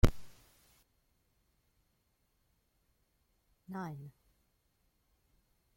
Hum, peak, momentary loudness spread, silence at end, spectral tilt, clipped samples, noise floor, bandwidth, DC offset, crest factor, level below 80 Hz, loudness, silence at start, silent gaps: none; -10 dBFS; 23 LU; 1.65 s; -6.5 dB/octave; under 0.1%; -77 dBFS; 16.5 kHz; under 0.1%; 30 dB; -44 dBFS; -41 LUFS; 0.05 s; none